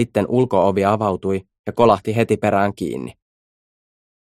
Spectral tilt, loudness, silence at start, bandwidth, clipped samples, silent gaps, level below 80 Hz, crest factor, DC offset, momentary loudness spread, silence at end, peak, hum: -7 dB/octave; -19 LUFS; 0 s; 15 kHz; under 0.1%; 1.59-1.64 s; -52 dBFS; 18 dB; under 0.1%; 11 LU; 1.1 s; -2 dBFS; none